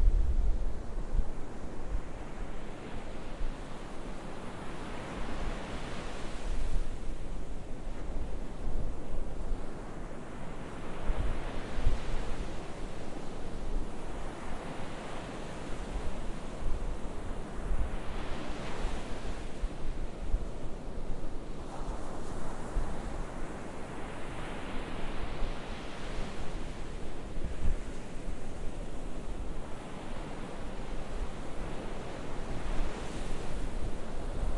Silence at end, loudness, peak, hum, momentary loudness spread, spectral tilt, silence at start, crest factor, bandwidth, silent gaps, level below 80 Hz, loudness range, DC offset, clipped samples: 0 s; -41 LUFS; -12 dBFS; none; 6 LU; -6 dB/octave; 0 s; 18 dB; 11 kHz; none; -36 dBFS; 3 LU; under 0.1%; under 0.1%